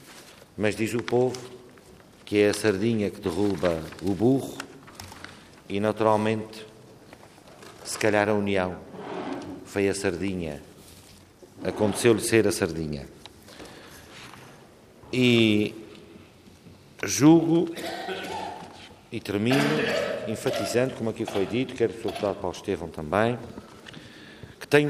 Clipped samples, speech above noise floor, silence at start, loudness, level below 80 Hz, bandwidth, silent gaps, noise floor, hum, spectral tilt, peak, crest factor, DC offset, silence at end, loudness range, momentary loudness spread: under 0.1%; 27 dB; 0.05 s; -25 LUFS; -60 dBFS; 15.5 kHz; none; -51 dBFS; none; -5 dB/octave; -6 dBFS; 22 dB; under 0.1%; 0 s; 5 LU; 23 LU